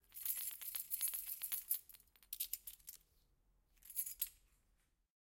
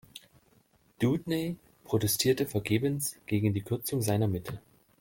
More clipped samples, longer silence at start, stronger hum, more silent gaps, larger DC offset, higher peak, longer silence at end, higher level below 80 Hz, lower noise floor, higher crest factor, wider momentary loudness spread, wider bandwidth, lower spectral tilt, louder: neither; about the same, 0.1 s vs 0.15 s; neither; neither; neither; second, -22 dBFS vs -12 dBFS; first, 0.9 s vs 0.4 s; second, -76 dBFS vs -62 dBFS; first, -79 dBFS vs -66 dBFS; first, 26 dB vs 18 dB; first, 19 LU vs 16 LU; about the same, 17 kHz vs 17 kHz; second, 2.5 dB/octave vs -5 dB/octave; second, -43 LUFS vs -30 LUFS